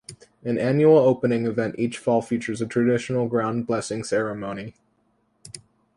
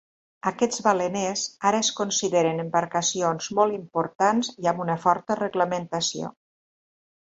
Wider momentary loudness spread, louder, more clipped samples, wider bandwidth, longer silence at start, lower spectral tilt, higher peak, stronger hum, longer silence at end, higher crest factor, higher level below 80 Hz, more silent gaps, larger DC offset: first, 19 LU vs 5 LU; about the same, -23 LUFS vs -24 LUFS; neither; first, 11.5 kHz vs 8.2 kHz; second, 0.1 s vs 0.45 s; first, -6.5 dB/octave vs -3.5 dB/octave; about the same, -6 dBFS vs -6 dBFS; neither; second, 0.4 s vs 1 s; about the same, 18 dB vs 20 dB; first, -62 dBFS vs -68 dBFS; second, none vs 4.15-4.19 s; neither